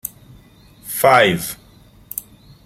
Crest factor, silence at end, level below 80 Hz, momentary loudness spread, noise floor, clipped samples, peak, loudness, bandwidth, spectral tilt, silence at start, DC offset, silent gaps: 18 dB; 0.45 s; -52 dBFS; 22 LU; -47 dBFS; under 0.1%; -2 dBFS; -15 LUFS; 16.5 kHz; -3.5 dB/octave; 0.05 s; under 0.1%; none